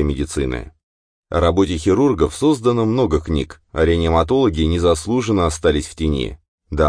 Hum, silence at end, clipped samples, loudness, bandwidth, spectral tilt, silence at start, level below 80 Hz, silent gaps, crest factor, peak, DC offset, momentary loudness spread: none; 0 s; under 0.1%; -18 LUFS; 10.5 kHz; -6 dB/octave; 0 s; -30 dBFS; 0.83-1.23 s, 6.48-6.58 s; 16 dB; -2 dBFS; under 0.1%; 8 LU